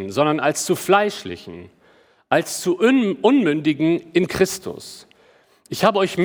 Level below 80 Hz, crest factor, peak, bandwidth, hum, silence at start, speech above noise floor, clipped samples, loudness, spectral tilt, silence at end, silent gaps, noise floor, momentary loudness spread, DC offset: -58 dBFS; 18 dB; -2 dBFS; over 20 kHz; none; 0 s; 36 dB; under 0.1%; -19 LUFS; -4.5 dB/octave; 0 s; none; -55 dBFS; 16 LU; under 0.1%